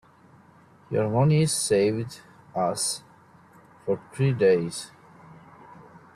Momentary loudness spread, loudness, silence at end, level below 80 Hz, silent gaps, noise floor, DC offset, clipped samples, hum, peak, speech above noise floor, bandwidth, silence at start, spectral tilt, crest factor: 16 LU; -25 LUFS; 0.35 s; -62 dBFS; none; -54 dBFS; under 0.1%; under 0.1%; none; -10 dBFS; 31 dB; 13 kHz; 0.9 s; -5 dB/octave; 16 dB